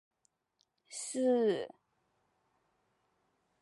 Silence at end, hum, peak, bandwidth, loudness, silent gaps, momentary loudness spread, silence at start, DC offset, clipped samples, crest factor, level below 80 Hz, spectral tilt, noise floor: 1.95 s; none; -20 dBFS; 11.5 kHz; -33 LUFS; none; 17 LU; 0.9 s; under 0.1%; under 0.1%; 18 dB; -90 dBFS; -4 dB/octave; -79 dBFS